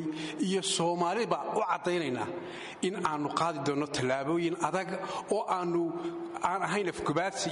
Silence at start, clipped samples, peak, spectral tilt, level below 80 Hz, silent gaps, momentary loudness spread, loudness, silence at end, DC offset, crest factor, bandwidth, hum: 0 s; under 0.1%; -12 dBFS; -4.5 dB/octave; -68 dBFS; none; 7 LU; -31 LUFS; 0 s; under 0.1%; 18 dB; 11.5 kHz; none